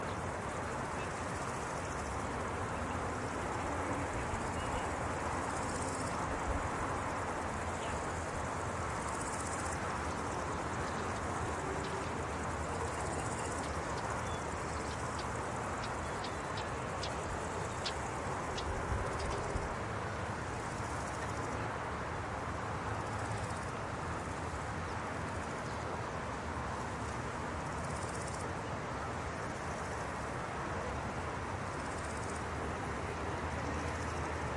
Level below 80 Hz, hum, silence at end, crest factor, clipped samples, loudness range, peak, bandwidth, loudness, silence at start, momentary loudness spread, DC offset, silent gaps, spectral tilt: -50 dBFS; none; 0 s; 16 dB; under 0.1%; 2 LU; -22 dBFS; 11.5 kHz; -38 LUFS; 0 s; 3 LU; under 0.1%; none; -4.5 dB/octave